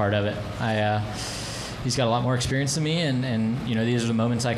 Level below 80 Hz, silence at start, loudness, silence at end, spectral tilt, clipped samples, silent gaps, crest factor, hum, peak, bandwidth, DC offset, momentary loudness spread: -46 dBFS; 0 s; -25 LUFS; 0 s; -5 dB/octave; under 0.1%; none; 14 dB; none; -10 dBFS; 13.5 kHz; under 0.1%; 7 LU